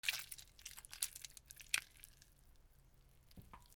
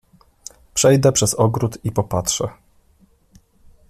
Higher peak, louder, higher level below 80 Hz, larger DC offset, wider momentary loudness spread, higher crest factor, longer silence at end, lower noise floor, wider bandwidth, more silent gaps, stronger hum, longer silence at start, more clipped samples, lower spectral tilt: second, -14 dBFS vs -2 dBFS; second, -45 LUFS vs -18 LUFS; second, -68 dBFS vs -48 dBFS; neither; about the same, 20 LU vs 22 LU; first, 36 dB vs 18 dB; second, 0 s vs 1.4 s; first, -67 dBFS vs -56 dBFS; first, over 20 kHz vs 14.5 kHz; neither; neither; second, 0.05 s vs 0.75 s; neither; second, 1 dB/octave vs -4.5 dB/octave